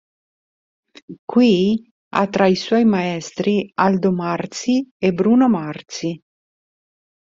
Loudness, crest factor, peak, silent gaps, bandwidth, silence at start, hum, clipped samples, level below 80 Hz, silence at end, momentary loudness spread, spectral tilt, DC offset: -18 LUFS; 18 dB; -2 dBFS; 1.19-1.28 s, 1.91-2.11 s, 4.91-5.00 s; 7.6 kHz; 1.1 s; none; under 0.1%; -58 dBFS; 1.1 s; 12 LU; -6 dB/octave; under 0.1%